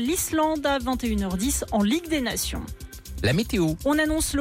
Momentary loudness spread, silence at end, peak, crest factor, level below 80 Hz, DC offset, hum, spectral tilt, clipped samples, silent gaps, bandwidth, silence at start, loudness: 7 LU; 0 s; -12 dBFS; 12 dB; -38 dBFS; under 0.1%; none; -4 dB/octave; under 0.1%; none; 16.5 kHz; 0 s; -24 LUFS